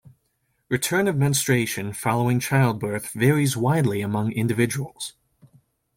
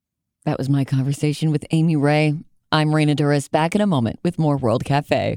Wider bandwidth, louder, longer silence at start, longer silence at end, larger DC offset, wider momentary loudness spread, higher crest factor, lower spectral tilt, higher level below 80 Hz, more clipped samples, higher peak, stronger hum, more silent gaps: first, 16.5 kHz vs 13 kHz; second, -23 LUFS vs -20 LUFS; first, 0.7 s vs 0.45 s; first, 0.85 s vs 0 s; neither; first, 8 LU vs 5 LU; about the same, 18 dB vs 18 dB; second, -5 dB/octave vs -7 dB/octave; second, -58 dBFS vs -52 dBFS; neither; second, -6 dBFS vs -2 dBFS; neither; neither